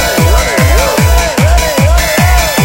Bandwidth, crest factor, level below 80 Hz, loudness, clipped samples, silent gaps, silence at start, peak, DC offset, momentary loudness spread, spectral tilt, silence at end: 17 kHz; 8 dB; -12 dBFS; -9 LUFS; 0.4%; none; 0 s; 0 dBFS; 0.5%; 1 LU; -4.5 dB/octave; 0 s